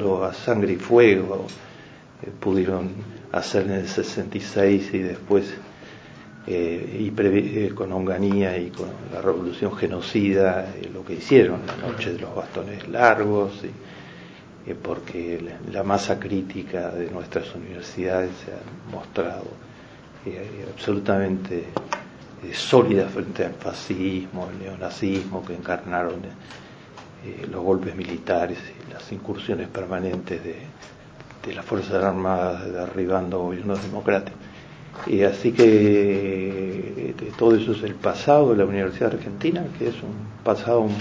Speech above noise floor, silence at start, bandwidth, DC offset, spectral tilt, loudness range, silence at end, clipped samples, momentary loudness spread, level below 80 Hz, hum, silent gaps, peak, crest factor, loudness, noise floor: 22 dB; 0 s; 8 kHz; under 0.1%; -6.5 dB/octave; 8 LU; 0 s; under 0.1%; 21 LU; -50 dBFS; none; none; 0 dBFS; 24 dB; -23 LUFS; -45 dBFS